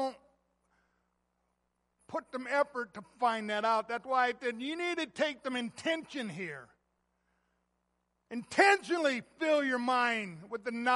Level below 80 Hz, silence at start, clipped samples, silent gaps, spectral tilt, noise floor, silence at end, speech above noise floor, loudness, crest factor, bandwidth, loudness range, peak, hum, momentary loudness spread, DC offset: -78 dBFS; 0 s; under 0.1%; none; -3.5 dB/octave; -80 dBFS; 0 s; 48 dB; -32 LUFS; 22 dB; 11.5 kHz; 8 LU; -12 dBFS; 60 Hz at -75 dBFS; 13 LU; under 0.1%